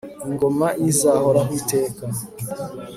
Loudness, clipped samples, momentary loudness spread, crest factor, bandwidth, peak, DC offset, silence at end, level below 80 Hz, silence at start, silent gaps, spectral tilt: -20 LUFS; under 0.1%; 13 LU; 16 dB; 16 kHz; -4 dBFS; under 0.1%; 0 s; -54 dBFS; 0.05 s; none; -5.5 dB/octave